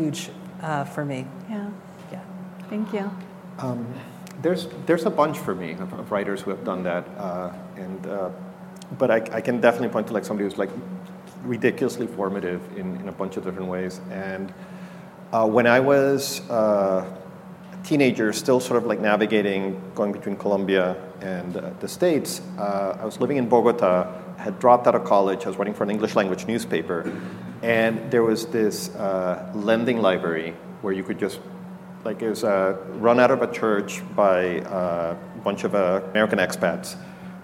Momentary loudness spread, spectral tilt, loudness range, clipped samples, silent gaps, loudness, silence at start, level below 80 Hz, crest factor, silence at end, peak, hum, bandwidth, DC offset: 17 LU; -5.5 dB/octave; 8 LU; under 0.1%; none; -24 LUFS; 0 s; -66 dBFS; 22 dB; 0 s; -2 dBFS; none; 16.5 kHz; under 0.1%